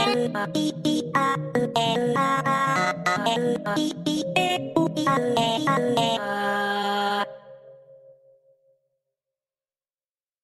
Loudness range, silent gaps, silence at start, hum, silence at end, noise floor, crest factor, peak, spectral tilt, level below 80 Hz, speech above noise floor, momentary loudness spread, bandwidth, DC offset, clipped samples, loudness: 7 LU; none; 0 s; none; 2.5 s; under -90 dBFS; 18 dB; -8 dBFS; -4.5 dB/octave; -66 dBFS; over 66 dB; 4 LU; 14.5 kHz; under 0.1%; under 0.1%; -24 LUFS